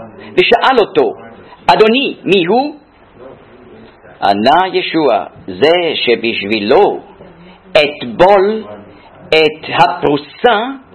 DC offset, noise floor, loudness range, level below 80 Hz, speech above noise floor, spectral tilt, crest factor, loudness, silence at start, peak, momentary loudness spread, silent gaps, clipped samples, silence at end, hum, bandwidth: under 0.1%; -38 dBFS; 2 LU; -48 dBFS; 27 dB; -5.5 dB/octave; 12 dB; -12 LUFS; 0 s; 0 dBFS; 9 LU; none; 0.4%; 0.15 s; none; 12 kHz